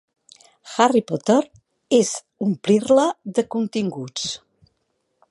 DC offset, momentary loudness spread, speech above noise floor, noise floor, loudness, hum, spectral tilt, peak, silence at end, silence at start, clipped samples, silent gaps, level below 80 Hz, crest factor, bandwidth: under 0.1%; 10 LU; 52 dB; -72 dBFS; -21 LUFS; none; -4.5 dB/octave; -2 dBFS; 0.95 s; 0.65 s; under 0.1%; none; -66 dBFS; 20 dB; 11.5 kHz